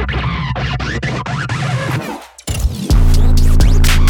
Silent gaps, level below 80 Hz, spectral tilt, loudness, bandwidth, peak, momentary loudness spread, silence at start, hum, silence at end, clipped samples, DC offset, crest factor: none; -14 dBFS; -5 dB/octave; -17 LUFS; 16.5 kHz; 0 dBFS; 8 LU; 0 s; none; 0 s; under 0.1%; under 0.1%; 12 dB